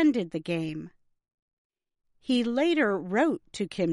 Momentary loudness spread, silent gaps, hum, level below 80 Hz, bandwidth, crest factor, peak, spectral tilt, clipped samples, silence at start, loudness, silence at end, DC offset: 14 LU; 1.34-1.70 s; none; -68 dBFS; 11.5 kHz; 16 dB; -12 dBFS; -6 dB/octave; under 0.1%; 0 s; -28 LUFS; 0 s; under 0.1%